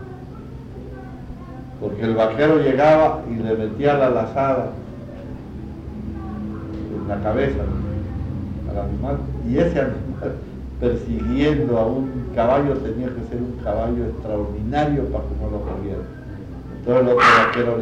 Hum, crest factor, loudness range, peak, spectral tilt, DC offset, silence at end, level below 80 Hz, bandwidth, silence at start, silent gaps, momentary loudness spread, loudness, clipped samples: none; 16 dB; 8 LU; -4 dBFS; -7.5 dB/octave; under 0.1%; 0 s; -34 dBFS; 9.8 kHz; 0 s; none; 19 LU; -21 LUFS; under 0.1%